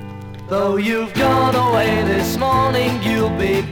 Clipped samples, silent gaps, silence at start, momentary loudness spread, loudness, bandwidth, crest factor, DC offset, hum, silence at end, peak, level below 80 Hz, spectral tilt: under 0.1%; none; 0 s; 5 LU; -17 LUFS; 19.5 kHz; 14 dB; under 0.1%; none; 0 s; -4 dBFS; -40 dBFS; -5.5 dB/octave